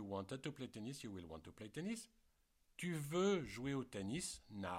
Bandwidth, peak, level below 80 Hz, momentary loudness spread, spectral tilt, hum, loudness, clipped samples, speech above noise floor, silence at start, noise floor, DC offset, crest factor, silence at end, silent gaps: 16.5 kHz; -28 dBFS; -70 dBFS; 14 LU; -5 dB/octave; none; -45 LUFS; under 0.1%; 32 dB; 0 s; -77 dBFS; under 0.1%; 18 dB; 0 s; none